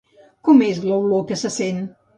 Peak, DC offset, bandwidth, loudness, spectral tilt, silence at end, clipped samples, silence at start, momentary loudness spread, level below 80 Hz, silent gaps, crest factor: -2 dBFS; under 0.1%; 10.5 kHz; -19 LUFS; -5.5 dB/octave; 0.3 s; under 0.1%; 0.45 s; 10 LU; -64 dBFS; none; 16 dB